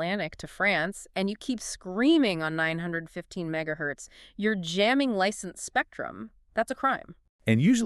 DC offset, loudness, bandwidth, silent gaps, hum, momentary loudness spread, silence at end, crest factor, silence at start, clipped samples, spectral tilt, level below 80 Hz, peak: under 0.1%; -28 LUFS; 13 kHz; 7.29-7.39 s; none; 12 LU; 0 s; 18 dB; 0 s; under 0.1%; -5 dB/octave; -60 dBFS; -10 dBFS